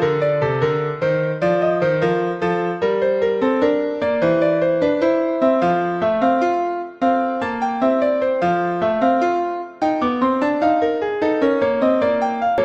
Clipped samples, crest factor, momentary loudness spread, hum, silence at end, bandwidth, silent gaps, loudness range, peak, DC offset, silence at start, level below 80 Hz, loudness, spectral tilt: under 0.1%; 12 dB; 3 LU; none; 0 s; 8 kHz; none; 1 LU; -6 dBFS; under 0.1%; 0 s; -54 dBFS; -19 LUFS; -7.5 dB/octave